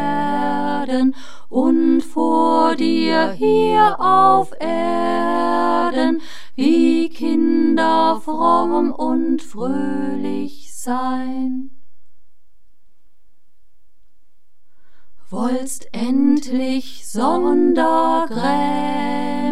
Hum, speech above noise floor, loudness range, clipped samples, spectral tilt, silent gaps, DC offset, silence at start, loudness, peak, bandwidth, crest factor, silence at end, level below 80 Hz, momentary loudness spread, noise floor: none; 48 dB; 12 LU; under 0.1%; -5 dB/octave; none; 6%; 0 s; -18 LUFS; -4 dBFS; 13 kHz; 16 dB; 0 s; -64 dBFS; 10 LU; -65 dBFS